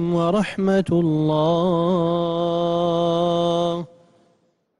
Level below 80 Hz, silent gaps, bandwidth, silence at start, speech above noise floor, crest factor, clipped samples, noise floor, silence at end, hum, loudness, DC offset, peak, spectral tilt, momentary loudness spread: -54 dBFS; none; 11 kHz; 0 s; 45 dB; 12 dB; under 0.1%; -64 dBFS; 0.95 s; none; -20 LUFS; under 0.1%; -8 dBFS; -7.5 dB/octave; 3 LU